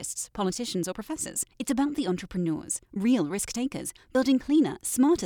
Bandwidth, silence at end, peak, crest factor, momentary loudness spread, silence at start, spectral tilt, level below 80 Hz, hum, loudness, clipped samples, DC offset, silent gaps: 19 kHz; 0 s; -12 dBFS; 14 dB; 9 LU; 0 s; -4.5 dB/octave; -56 dBFS; none; -28 LUFS; under 0.1%; under 0.1%; none